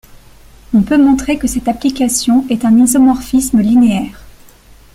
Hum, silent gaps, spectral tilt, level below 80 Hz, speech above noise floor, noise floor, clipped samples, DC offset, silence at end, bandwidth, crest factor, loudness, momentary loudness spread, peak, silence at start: none; none; -4.5 dB/octave; -36 dBFS; 30 dB; -41 dBFS; under 0.1%; under 0.1%; 0.65 s; 15.5 kHz; 12 dB; -12 LUFS; 7 LU; 0 dBFS; 0.7 s